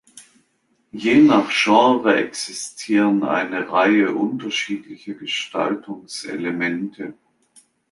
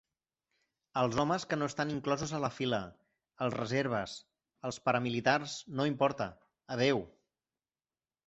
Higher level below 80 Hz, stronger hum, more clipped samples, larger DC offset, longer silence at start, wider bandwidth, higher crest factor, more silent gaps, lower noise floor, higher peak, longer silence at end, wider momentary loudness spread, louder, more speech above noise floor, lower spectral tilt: about the same, -66 dBFS vs -66 dBFS; neither; neither; neither; second, 0.15 s vs 0.95 s; first, 11.5 kHz vs 8 kHz; about the same, 18 dB vs 22 dB; neither; second, -66 dBFS vs under -90 dBFS; first, -2 dBFS vs -12 dBFS; second, 0.8 s vs 1.2 s; first, 16 LU vs 11 LU; first, -19 LUFS vs -34 LUFS; second, 47 dB vs over 57 dB; about the same, -4 dB/octave vs -4 dB/octave